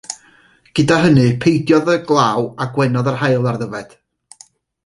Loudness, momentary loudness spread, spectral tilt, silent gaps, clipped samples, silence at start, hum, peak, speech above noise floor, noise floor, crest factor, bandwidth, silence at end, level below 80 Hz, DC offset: -15 LUFS; 13 LU; -6.5 dB/octave; none; under 0.1%; 0.1 s; none; -2 dBFS; 36 dB; -51 dBFS; 16 dB; 11.5 kHz; 1 s; -50 dBFS; under 0.1%